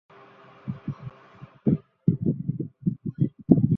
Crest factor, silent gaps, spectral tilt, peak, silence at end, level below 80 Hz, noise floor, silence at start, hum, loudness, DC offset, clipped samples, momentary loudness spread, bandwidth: 24 dB; none; -13 dB/octave; -2 dBFS; 0 s; -52 dBFS; -51 dBFS; 0.65 s; none; -28 LUFS; under 0.1%; under 0.1%; 17 LU; 3.6 kHz